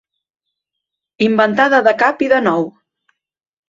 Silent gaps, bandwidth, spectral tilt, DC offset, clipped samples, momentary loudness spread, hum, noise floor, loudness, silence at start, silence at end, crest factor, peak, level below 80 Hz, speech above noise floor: none; 7.6 kHz; -6 dB/octave; under 0.1%; under 0.1%; 7 LU; none; -80 dBFS; -14 LUFS; 1.2 s; 1 s; 16 dB; 0 dBFS; -62 dBFS; 67 dB